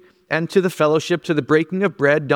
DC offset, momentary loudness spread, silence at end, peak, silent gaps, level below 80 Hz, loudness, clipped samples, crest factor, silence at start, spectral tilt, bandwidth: under 0.1%; 5 LU; 0 s; -2 dBFS; none; -64 dBFS; -19 LUFS; under 0.1%; 16 dB; 0.3 s; -6 dB/octave; 17.5 kHz